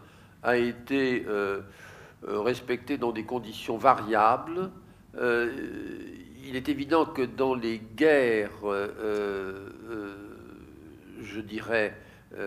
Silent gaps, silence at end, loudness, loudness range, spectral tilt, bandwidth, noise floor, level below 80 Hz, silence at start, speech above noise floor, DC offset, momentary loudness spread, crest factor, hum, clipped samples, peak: none; 0 s; -28 LUFS; 6 LU; -6 dB/octave; 15.5 kHz; -49 dBFS; -60 dBFS; 0 s; 21 dB; under 0.1%; 21 LU; 24 dB; none; under 0.1%; -4 dBFS